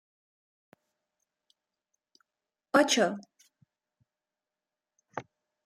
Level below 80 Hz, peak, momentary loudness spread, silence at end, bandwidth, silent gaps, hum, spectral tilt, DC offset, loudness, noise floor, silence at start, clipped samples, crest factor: -84 dBFS; -10 dBFS; 20 LU; 0.45 s; 16 kHz; none; none; -2.5 dB/octave; under 0.1%; -26 LUFS; under -90 dBFS; 2.75 s; under 0.1%; 24 dB